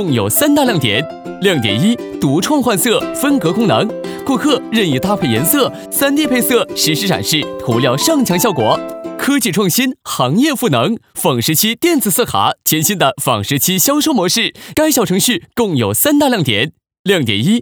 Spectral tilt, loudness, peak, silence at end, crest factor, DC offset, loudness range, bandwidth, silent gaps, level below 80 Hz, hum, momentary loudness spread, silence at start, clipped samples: -4 dB/octave; -14 LUFS; 0 dBFS; 0 s; 14 dB; under 0.1%; 1 LU; over 20 kHz; 16.99-17.04 s; -50 dBFS; none; 5 LU; 0 s; under 0.1%